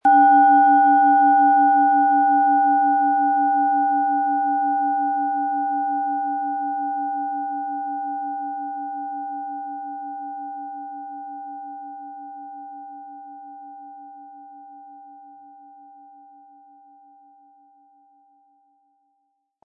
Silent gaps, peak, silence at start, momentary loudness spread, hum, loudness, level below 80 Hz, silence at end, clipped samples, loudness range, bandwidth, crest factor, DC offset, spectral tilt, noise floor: none; -6 dBFS; 0.05 s; 23 LU; none; -19 LUFS; -80 dBFS; 4.45 s; under 0.1%; 23 LU; 3.4 kHz; 16 dB; under 0.1%; -6 dB/octave; -72 dBFS